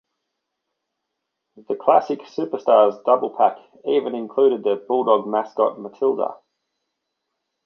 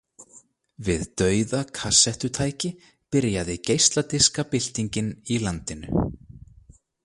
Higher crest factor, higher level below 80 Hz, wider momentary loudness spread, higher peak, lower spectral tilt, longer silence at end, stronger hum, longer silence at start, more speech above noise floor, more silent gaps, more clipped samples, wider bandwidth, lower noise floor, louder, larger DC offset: about the same, 20 dB vs 22 dB; second, -76 dBFS vs -44 dBFS; about the same, 10 LU vs 11 LU; about the same, -2 dBFS vs -4 dBFS; first, -7 dB/octave vs -3.5 dB/octave; first, 1.3 s vs 0.6 s; neither; first, 1.55 s vs 0.2 s; first, 60 dB vs 31 dB; neither; neither; second, 6.2 kHz vs 11.5 kHz; first, -79 dBFS vs -55 dBFS; first, -20 LUFS vs -23 LUFS; neither